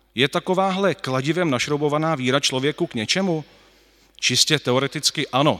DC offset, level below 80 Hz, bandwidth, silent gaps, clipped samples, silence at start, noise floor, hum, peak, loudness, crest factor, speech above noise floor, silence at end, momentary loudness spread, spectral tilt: under 0.1%; -62 dBFS; 16 kHz; none; under 0.1%; 0.15 s; -55 dBFS; none; 0 dBFS; -21 LUFS; 20 dB; 35 dB; 0 s; 6 LU; -3.5 dB/octave